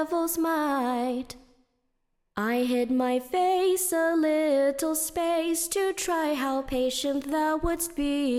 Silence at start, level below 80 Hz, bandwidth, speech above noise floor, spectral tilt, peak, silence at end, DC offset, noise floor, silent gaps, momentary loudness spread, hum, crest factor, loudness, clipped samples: 0 s; -48 dBFS; 16.5 kHz; 49 dB; -3 dB/octave; -14 dBFS; 0 s; under 0.1%; -75 dBFS; none; 5 LU; none; 12 dB; -26 LUFS; under 0.1%